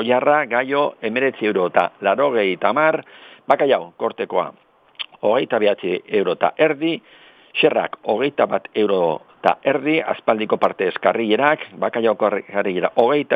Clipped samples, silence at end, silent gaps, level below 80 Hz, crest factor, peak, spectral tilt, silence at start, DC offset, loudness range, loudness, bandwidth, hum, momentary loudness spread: under 0.1%; 0 s; none; -74 dBFS; 18 dB; 0 dBFS; -7.5 dB/octave; 0 s; under 0.1%; 2 LU; -19 LUFS; 5.2 kHz; none; 7 LU